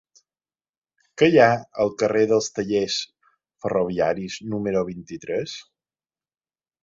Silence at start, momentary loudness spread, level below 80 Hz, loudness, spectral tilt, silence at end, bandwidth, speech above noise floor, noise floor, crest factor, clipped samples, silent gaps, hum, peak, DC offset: 1.15 s; 16 LU; -58 dBFS; -22 LUFS; -5 dB/octave; 1.2 s; 7.8 kHz; over 69 dB; under -90 dBFS; 22 dB; under 0.1%; none; none; -2 dBFS; under 0.1%